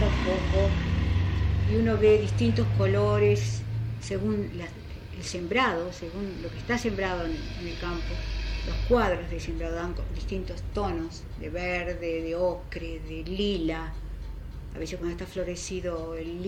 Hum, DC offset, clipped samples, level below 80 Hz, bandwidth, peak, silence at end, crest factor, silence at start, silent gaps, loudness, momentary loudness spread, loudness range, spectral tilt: none; under 0.1%; under 0.1%; -36 dBFS; 11.5 kHz; -12 dBFS; 0 s; 16 dB; 0 s; none; -29 LUFS; 13 LU; 8 LU; -6.5 dB/octave